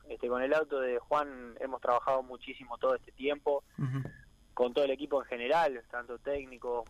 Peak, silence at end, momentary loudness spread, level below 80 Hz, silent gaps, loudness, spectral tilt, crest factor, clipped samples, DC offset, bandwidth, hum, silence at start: -16 dBFS; 0 s; 12 LU; -62 dBFS; none; -33 LUFS; -6.5 dB/octave; 18 dB; under 0.1%; under 0.1%; 13 kHz; none; 0.05 s